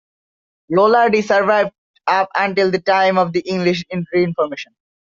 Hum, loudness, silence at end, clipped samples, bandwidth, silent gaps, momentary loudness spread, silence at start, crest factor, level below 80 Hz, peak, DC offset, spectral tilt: none; -16 LUFS; 0.4 s; under 0.1%; 7.4 kHz; 1.78-1.94 s; 9 LU; 0.7 s; 14 dB; -62 dBFS; -2 dBFS; under 0.1%; -4 dB/octave